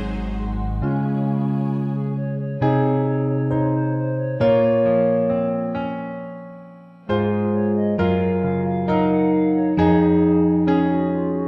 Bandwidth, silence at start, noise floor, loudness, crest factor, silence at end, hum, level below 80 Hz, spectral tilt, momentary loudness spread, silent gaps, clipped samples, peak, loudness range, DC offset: 5.8 kHz; 0 s; -42 dBFS; -20 LUFS; 14 dB; 0 s; none; -38 dBFS; -10.5 dB/octave; 10 LU; none; under 0.1%; -4 dBFS; 4 LU; under 0.1%